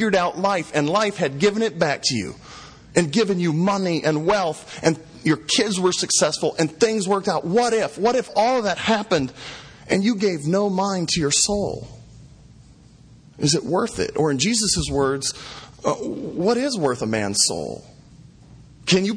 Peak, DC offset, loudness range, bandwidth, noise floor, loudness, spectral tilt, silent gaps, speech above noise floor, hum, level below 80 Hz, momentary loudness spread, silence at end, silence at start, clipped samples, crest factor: -2 dBFS; under 0.1%; 3 LU; 10.5 kHz; -48 dBFS; -21 LUFS; -4 dB/octave; none; 27 dB; none; -48 dBFS; 10 LU; 0 s; 0 s; under 0.1%; 20 dB